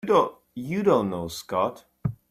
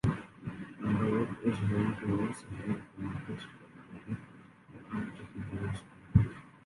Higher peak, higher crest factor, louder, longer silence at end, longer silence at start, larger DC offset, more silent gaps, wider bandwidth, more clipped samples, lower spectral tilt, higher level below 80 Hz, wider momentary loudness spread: about the same, -8 dBFS vs -10 dBFS; second, 18 dB vs 24 dB; first, -26 LUFS vs -35 LUFS; about the same, 0.15 s vs 0.1 s; about the same, 0.05 s vs 0.05 s; neither; neither; first, 16 kHz vs 11.5 kHz; neither; second, -6.5 dB/octave vs -8 dB/octave; second, -56 dBFS vs -50 dBFS; second, 11 LU vs 19 LU